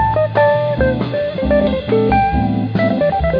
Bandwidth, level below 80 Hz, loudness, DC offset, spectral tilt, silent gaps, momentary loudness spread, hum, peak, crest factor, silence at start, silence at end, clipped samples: 5.4 kHz; -28 dBFS; -15 LUFS; under 0.1%; -10 dB/octave; none; 4 LU; none; -2 dBFS; 12 dB; 0 s; 0 s; under 0.1%